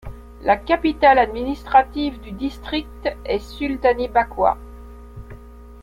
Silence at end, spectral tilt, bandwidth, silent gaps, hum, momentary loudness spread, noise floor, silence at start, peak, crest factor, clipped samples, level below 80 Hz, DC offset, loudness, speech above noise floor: 0.05 s; -6.5 dB/octave; 14.5 kHz; none; none; 25 LU; -40 dBFS; 0.05 s; -2 dBFS; 18 dB; under 0.1%; -38 dBFS; under 0.1%; -20 LUFS; 20 dB